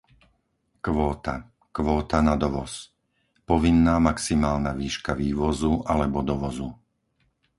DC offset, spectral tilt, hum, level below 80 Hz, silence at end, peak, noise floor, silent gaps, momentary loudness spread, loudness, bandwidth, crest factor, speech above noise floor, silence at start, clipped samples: under 0.1%; -6 dB/octave; none; -36 dBFS; 0.85 s; -4 dBFS; -71 dBFS; none; 14 LU; -24 LUFS; 11.5 kHz; 20 dB; 48 dB; 0.85 s; under 0.1%